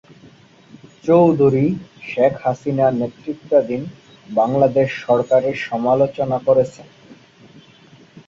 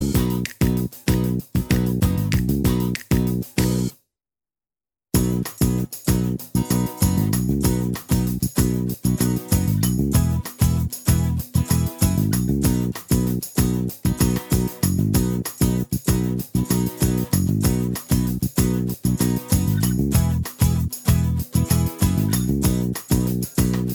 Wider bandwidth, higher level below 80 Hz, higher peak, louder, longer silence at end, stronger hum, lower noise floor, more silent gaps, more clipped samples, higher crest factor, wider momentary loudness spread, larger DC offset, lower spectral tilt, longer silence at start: second, 7.6 kHz vs over 20 kHz; second, -56 dBFS vs -30 dBFS; about the same, -2 dBFS vs -2 dBFS; first, -18 LUFS vs -21 LUFS; about the same, 0.1 s vs 0 s; neither; second, -47 dBFS vs under -90 dBFS; neither; neither; about the same, 16 dB vs 18 dB; first, 12 LU vs 4 LU; neither; first, -8 dB/octave vs -6 dB/octave; first, 1.05 s vs 0 s